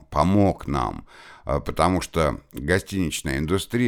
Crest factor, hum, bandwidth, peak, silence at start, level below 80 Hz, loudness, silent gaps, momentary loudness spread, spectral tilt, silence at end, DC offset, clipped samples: 20 dB; none; 18 kHz; -4 dBFS; 0.1 s; -38 dBFS; -24 LUFS; none; 9 LU; -5.5 dB/octave; 0 s; under 0.1%; under 0.1%